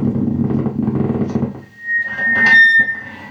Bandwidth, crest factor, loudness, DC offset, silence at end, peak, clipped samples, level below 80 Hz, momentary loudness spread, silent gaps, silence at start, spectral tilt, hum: 9.6 kHz; 14 dB; -13 LUFS; under 0.1%; 0 s; -2 dBFS; under 0.1%; -48 dBFS; 15 LU; none; 0 s; -6.5 dB/octave; none